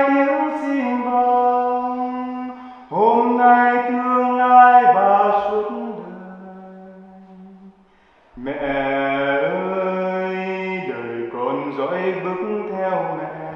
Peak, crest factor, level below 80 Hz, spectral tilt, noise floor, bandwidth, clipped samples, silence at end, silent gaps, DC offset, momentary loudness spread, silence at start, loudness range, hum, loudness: 0 dBFS; 18 dB; -58 dBFS; -7.5 dB/octave; -54 dBFS; 6 kHz; under 0.1%; 0 s; none; under 0.1%; 17 LU; 0 s; 11 LU; none; -18 LUFS